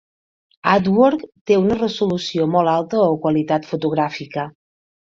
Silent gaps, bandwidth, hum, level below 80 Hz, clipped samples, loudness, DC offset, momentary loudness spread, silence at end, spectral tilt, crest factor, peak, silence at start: 1.41-1.45 s; 7.6 kHz; none; -54 dBFS; under 0.1%; -18 LUFS; under 0.1%; 11 LU; 0.55 s; -7 dB/octave; 18 dB; -2 dBFS; 0.65 s